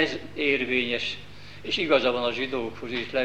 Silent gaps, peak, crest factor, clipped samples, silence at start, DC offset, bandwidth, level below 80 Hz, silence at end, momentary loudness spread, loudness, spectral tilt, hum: none; -8 dBFS; 20 dB; under 0.1%; 0 s; 0.7%; 11 kHz; -56 dBFS; 0 s; 11 LU; -26 LUFS; -4.5 dB/octave; 50 Hz at -50 dBFS